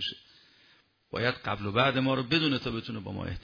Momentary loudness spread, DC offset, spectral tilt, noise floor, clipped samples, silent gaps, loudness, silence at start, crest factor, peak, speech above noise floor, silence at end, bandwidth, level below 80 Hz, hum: 12 LU; under 0.1%; -6.5 dB/octave; -64 dBFS; under 0.1%; none; -29 LUFS; 0 s; 20 dB; -10 dBFS; 35 dB; 0 s; 5.4 kHz; -56 dBFS; none